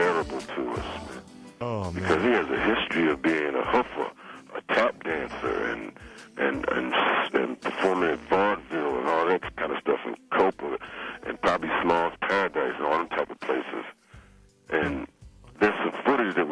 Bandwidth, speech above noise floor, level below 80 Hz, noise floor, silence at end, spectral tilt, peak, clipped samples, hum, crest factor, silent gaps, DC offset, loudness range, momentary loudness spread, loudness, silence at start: 11 kHz; 31 dB; -54 dBFS; -55 dBFS; 0 s; -5.5 dB/octave; -10 dBFS; under 0.1%; none; 18 dB; none; under 0.1%; 3 LU; 12 LU; -27 LUFS; 0 s